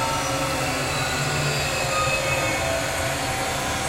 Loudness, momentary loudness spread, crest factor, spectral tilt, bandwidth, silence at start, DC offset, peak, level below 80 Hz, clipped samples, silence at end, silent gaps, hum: -23 LUFS; 3 LU; 14 dB; -3 dB/octave; 16 kHz; 0 s; under 0.1%; -10 dBFS; -40 dBFS; under 0.1%; 0 s; none; none